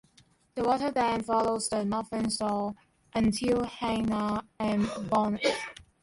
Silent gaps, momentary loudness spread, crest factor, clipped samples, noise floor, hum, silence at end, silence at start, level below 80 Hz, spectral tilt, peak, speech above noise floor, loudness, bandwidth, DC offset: none; 8 LU; 16 dB; under 0.1%; -63 dBFS; none; 0.2 s; 0.55 s; -56 dBFS; -5 dB/octave; -14 dBFS; 35 dB; -29 LUFS; 11.5 kHz; under 0.1%